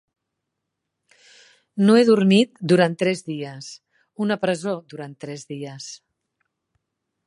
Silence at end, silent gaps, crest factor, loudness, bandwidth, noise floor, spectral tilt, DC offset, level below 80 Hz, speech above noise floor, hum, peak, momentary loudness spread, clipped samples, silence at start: 1.3 s; none; 20 dB; -20 LUFS; 11.5 kHz; -80 dBFS; -6 dB/octave; under 0.1%; -72 dBFS; 60 dB; none; -4 dBFS; 21 LU; under 0.1%; 1.75 s